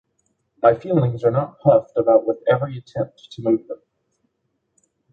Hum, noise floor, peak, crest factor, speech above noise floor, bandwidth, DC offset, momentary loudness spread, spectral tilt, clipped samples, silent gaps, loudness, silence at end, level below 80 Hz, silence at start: none; -73 dBFS; -2 dBFS; 18 dB; 54 dB; 6.8 kHz; under 0.1%; 11 LU; -9.5 dB/octave; under 0.1%; none; -20 LUFS; 1.35 s; -58 dBFS; 0.65 s